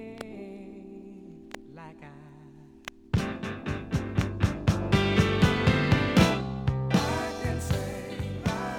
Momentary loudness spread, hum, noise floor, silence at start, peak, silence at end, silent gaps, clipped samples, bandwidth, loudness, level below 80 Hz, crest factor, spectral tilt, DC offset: 22 LU; none; -50 dBFS; 0 s; -6 dBFS; 0 s; none; under 0.1%; 17.5 kHz; -27 LUFS; -42 dBFS; 22 dB; -6 dB/octave; under 0.1%